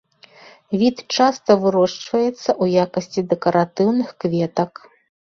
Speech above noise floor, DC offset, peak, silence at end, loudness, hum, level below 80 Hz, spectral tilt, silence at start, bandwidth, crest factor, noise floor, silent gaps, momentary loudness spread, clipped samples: 29 dB; under 0.1%; -2 dBFS; 0.7 s; -19 LUFS; none; -60 dBFS; -6 dB/octave; 0.7 s; 7.4 kHz; 18 dB; -47 dBFS; none; 6 LU; under 0.1%